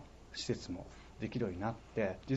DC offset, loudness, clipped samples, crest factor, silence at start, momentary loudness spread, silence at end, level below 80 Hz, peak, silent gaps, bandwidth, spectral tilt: under 0.1%; -40 LUFS; under 0.1%; 18 dB; 0 s; 9 LU; 0 s; -58 dBFS; -22 dBFS; none; 8.2 kHz; -6 dB/octave